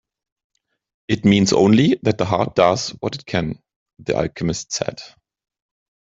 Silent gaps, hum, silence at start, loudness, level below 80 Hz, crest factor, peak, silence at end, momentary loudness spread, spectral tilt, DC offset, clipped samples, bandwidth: 3.76-3.86 s; none; 1.1 s; -19 LUFS; -50 dBFS; 18 dB; -2 dBFS; 0.95 s; 14 LU; -5.5 dB/octave; under 0.1%; under 0.1%; 8 kHz